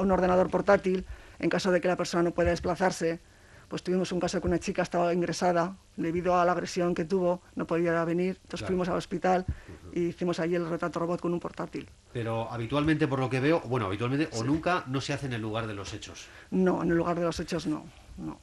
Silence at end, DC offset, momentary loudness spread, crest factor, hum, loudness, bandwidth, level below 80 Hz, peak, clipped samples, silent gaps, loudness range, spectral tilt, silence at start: 0.05 s; under 0.1%; 12 LU; 20 dB; none; -29 LUFS; 12 kHz; -50 dBFS; -10 dBFS; under 0.1%; none; 3 LU; -6 dB/octave; 0 s